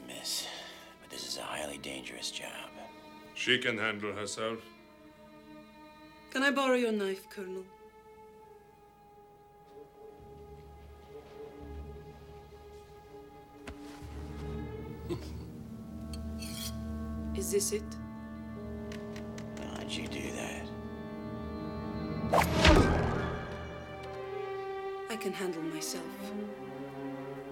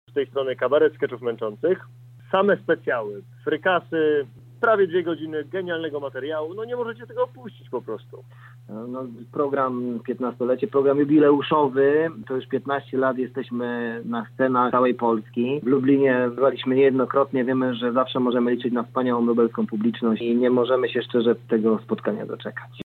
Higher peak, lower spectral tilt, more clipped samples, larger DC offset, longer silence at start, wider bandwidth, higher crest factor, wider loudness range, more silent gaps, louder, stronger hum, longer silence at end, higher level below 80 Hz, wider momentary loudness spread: about the same, -10 dBFS vs -8 dBFS; second, -4.5 dB/octave vs -8.5 dB/octave; neither; neither; second, 0 s vs 0.15 s; first, 17.5 kHz vs 4.4 kHz; first, 28 dB vs 14 dB; first, 20 LU vs 8 LU; neither; second, -35 LUFS vs -23 LUFS; neither; about the same, 0 s vs 0 s; first, -46 dBFS vs -72 dBFS; first, 24 LU vs 11 LU